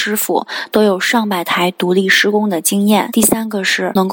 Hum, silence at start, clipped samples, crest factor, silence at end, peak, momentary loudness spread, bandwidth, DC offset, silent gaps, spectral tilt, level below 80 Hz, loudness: none; 0 s; under 0.1%; 14 dB; 0 s; 0 dBFS; 5 LU; 17 kHz; under 0.1%; none; -3.5 dB/octave; -56 dBFS; -14 LUFS